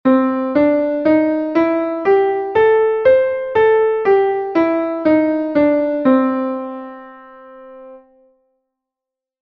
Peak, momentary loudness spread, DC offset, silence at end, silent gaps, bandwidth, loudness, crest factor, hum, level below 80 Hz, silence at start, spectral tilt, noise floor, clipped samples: -2 dBFS; 6 LU; under 0.1%; 1.45 s; none; 5.8 kHz; -15 LUFS; 14 dB; none; -54 dBFS; 0.05 s; -8 dB/octave; -86 dBFS; under 0.1%